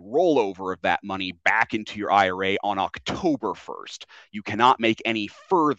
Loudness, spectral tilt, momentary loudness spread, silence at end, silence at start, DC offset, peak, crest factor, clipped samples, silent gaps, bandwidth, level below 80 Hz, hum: -23 LUFS; -5 dB/octave; 16 LU; 0.05 s; 0 s; under 0.1%; -4 dBFS; 20 dB; under 0.1%; none; 8.2 kHz; -62 dBFS; none